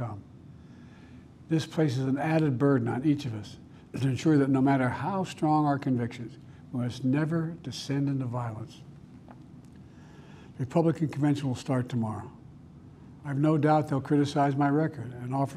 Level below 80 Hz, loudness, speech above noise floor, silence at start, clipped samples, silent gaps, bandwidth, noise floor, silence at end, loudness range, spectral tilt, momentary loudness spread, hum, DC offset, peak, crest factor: -62 dBFS; -28 LUFS; 23 dB; 0 s; under 0.1%; none; 12 kHz; -50 dBFS; 0 s; 6 LU; -7.5 dB/octave; 19 LU; none; under 0.1%; -12 dBFS; 18 dB